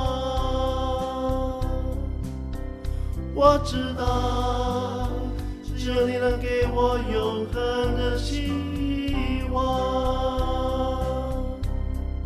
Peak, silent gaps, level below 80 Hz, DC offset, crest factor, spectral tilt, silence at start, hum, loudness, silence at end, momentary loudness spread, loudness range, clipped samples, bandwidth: -4 dBFS; none; -30 dBFS; under 0.1%; 20 dB; -6.5 dB/octave; 0 s; none; -26 LUFS; 0 s; 8 LU; 1 LU; under 0.1%; 14 kHz